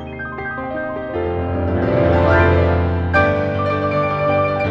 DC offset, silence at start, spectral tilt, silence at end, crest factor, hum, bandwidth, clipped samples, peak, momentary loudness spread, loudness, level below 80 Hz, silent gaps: under 0.1%; 0 s; -9 dB/octave; 0 s; 16 dB; none; 5.8 kHz; under 0.1%; -2 dBFS; 11 LU; -18 LUFS; -32 dBFS; none